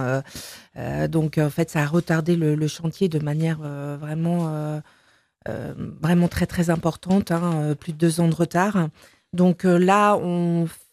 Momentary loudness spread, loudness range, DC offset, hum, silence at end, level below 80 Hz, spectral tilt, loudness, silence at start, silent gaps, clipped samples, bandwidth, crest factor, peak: 13 LU; 5 LU; under 0.1%; none; 0.15 s; -52 dBFS; -7 dB/octave; -22 LUFS; 0 s; none; under 0.1%; 14.5 kHz; 18 dB; -4 dBFS